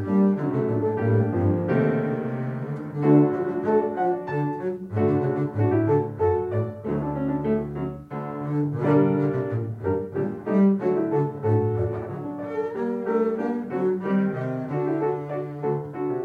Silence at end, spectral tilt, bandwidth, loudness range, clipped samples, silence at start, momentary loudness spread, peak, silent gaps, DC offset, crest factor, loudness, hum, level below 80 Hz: 0 s; -11 dB/octave; 4.9 kHz; 3 LU; under 0.1%; 0 s; 9 LU; -6 dBFS; none; under 0.1%; 18 dB; -25 LUFS; none; -58 dBFS